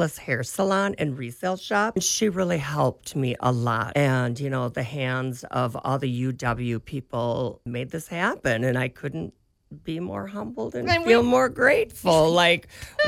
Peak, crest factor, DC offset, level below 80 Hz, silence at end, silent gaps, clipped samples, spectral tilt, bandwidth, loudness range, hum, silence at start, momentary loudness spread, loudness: -4 dBFS; 20 dB; under 0.1%; -52 dBFS; 0 s; none; under 0.1%; -5 dB/octave; 16 kHz; 7 LU; none; 0 s; 13 LU; -24 LUFS